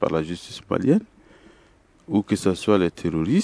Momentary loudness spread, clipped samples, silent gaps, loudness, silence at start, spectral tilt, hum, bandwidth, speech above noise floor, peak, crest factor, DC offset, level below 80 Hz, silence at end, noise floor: 7 LU; under 0.1%; none; -23 LUFS; 0 s; -6.5 dB/octave; none; 11 kHz; 34 dB; -4 dBFS; 18 dB; under 0.1%; -52 dBFS; 0 s; -56 dBFS